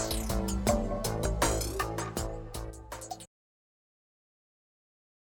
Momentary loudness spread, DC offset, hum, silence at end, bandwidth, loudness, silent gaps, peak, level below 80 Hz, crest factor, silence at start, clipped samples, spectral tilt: 14 LU; under 0.1%; none; 2.1 s; 20 kHz; -33 LUFS; none; -12 dBFS; -40 dBFS; 22 dB; 0 s; under 0.1%; -4.5 dB/octave